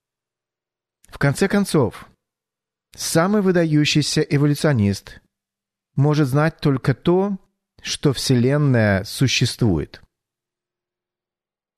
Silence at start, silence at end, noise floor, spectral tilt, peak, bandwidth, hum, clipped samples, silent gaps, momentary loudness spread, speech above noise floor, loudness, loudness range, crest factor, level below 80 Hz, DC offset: 1.15 s; 1.8 s; under -90 dBFS; -5.5 dB/octave; -4 dBFS; 13.5 kHz; none; under 0.1%; none; 9 LU; over 72 dB; -19 LUFS; 2 LU; 16 dB; -48 dBFS; under 0.1%